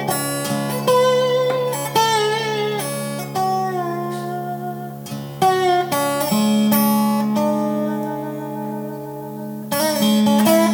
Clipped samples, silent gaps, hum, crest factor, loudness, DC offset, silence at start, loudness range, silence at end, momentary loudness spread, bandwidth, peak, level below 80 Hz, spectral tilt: under 0.1%; none; none; 16 dB; -19 LUFS; under 0.1%; 0 s; 4 LU; 0 s; 13 LU; over 20 kHz; -2 dBFS; -64 dBFS; -4.5 dB/octave